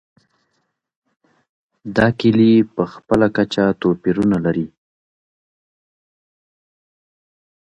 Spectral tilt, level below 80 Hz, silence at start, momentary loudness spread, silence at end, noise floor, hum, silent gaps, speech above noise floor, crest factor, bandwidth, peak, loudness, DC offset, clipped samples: -7.5 dB/octave; -50 dBFS; 1.85 s; 11 LU; 3.05 s; -71 dBFS; none; none; 55 dB; 20 dB; 8.2 kHz; 0 dBFS; -17 LUFS; under 0.1%; under 0.1%